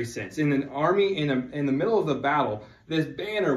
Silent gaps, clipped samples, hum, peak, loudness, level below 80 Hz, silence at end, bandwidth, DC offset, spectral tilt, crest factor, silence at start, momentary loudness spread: none; under 0.1%; none; -10 dBFS; -26 LUFS; -60 dBFS; 0 s; 13 kHz; under 0.1%; -6.5 dB/octave; 16 dB; 0 s; 7 LU